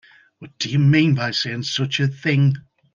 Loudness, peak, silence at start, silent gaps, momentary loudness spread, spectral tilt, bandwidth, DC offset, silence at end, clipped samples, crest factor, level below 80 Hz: -19 LUFS; -4 dBFS; 0.4 s; none; 7 LU; -5.5 dB/octave; 7.2 kHz; under 0.1%; 0.35 s; under 0.1%; 16 dB; -60 dBFS